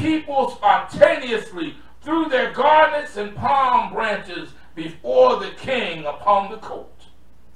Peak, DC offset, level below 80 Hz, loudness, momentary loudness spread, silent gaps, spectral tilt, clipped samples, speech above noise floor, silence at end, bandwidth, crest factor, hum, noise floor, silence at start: 0 dBFS; 1%; -52 dBFS; -19 LUFS; 18 LU; none; -5 dB/octave; under 0.1%; 33 dB; 0.7 s; 11 kHz; 20 dB; none; -52 dBFS; 0 s